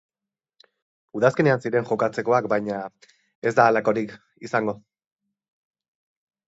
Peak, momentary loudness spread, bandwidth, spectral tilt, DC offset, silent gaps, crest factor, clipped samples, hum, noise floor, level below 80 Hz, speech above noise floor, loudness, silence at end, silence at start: -4 dBFS; 17 LU; 8 kHz; -7 dB/octave; under 0.1%; 3.35-3.42 s; 22 dB; under 0.1%; none; -90 dBFS; -68 dBFS; 68 dB; -22 LUFS; 1.8 s; 1.15 s